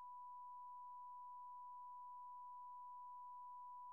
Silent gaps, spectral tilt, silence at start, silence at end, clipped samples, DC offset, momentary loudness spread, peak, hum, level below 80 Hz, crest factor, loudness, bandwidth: none; 10.5 dB/octave; 0 s; 0 s; under 0.1%; under 0.1%; 0 LU; -52 dBFS; none; under -90 dBFS; 4 dB; -56 LUFS; 1.1 kHz